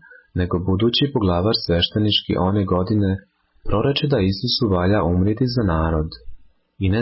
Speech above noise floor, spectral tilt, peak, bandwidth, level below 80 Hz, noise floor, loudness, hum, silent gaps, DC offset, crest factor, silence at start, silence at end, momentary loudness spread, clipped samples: 21 dB; -10 dB/octave; -8 dBFS; 5.8 kHz; -32 dBFS; -40 dBFS; -20 LUFS; none; none; under 0.1%; 12 dB; 0.35 s; 0 s; 7 LU; under 0.1%